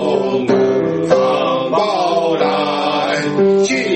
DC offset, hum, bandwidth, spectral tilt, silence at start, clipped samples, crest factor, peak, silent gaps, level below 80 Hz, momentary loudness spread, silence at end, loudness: under 0.1%; none; 8.6 kHz; -5 dB/octave; 0 s; under 0.1%; 14 dB; 0 dBFS; none; -56 dBFS; 3 LU; 0 s; -15 LUFS